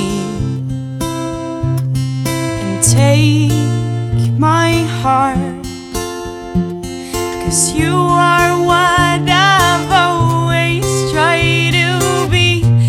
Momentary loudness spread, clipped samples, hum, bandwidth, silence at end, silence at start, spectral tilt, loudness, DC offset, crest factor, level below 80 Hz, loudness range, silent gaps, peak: 11 LU; under 0.1%; none; 16 kHz; 0 s; 0 s; -4.5 dB/octave; -13 LUFS; under 0.1%; 14 dB; -34 dBFS; 5 LU; none; 0 dBFS